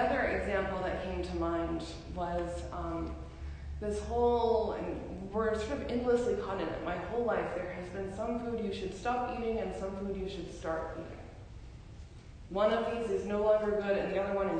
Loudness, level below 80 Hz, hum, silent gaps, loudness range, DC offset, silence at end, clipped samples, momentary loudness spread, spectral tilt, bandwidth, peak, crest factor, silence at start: -34 LUFS; -46 dBFS; none; none; 5 LU; under 0.1%; 0 s; under 0.1%; 15 LU; -6.5 dB/octave; 9.6 kHz; -18 dBFS; 16 dB; 0 s